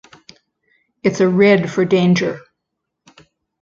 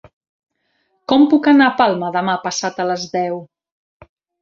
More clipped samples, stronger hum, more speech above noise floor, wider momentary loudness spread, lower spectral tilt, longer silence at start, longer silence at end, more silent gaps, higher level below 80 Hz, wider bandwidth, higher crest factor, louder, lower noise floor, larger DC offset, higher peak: neither; neither; first, 63 dB vs 51 dB; about the same, 10 LU vs 11 LU; first, -6.5 dB/octave vs -4.5 dB/octave; about the same, 1.05 s vs 1.1 s; first, 1.2 s vs 0.95 s; neither; about the same, -58 dBFS vs -60 dBFS; about the same, 7.4 kHz vs 7.6 kHz; about the same, 16 dB vs 18 dB; about the same, -15 LUFS vs -16 LUFS; first, -77 dBFS vs -66 dBFS; neither; about the same, -2 dBFS vs 0 dBFS